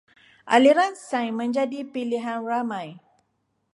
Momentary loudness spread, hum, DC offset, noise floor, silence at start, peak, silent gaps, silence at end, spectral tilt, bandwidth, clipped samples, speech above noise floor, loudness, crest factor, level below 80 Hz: 13 LU; none; under 0.1%; -73 dBFS; 0.45 s; -4 dBFS; none; 0.75 s; -4.5 dB/octave; 11.5 kHz; under 0.1%; 50 dB; -23 LUFS; 20 dB; -78 dBFS